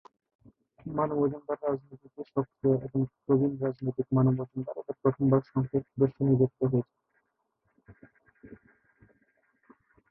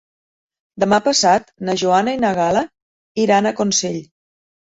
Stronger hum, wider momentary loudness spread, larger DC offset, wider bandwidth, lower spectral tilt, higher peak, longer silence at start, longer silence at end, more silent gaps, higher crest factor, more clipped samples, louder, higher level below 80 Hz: neither; about the same, 11 LU vs 11 LU; neither; second, 2.6 kHz vs 8.2 kHz; first, -13.5 dB/octave vs -3.5 dB/octave; second, -12 dBFS vs -2 dBFS; about the same, 0.85 s vs 0.75 s; first, 1.55 s vs 0.7 s; second, none vs 2.82-3.15 s; about the same, 20 dB vs 16 dB; neither; second, -29 LUFS vs -17 LUFS; second, -64 dBFS vs -56 dBFS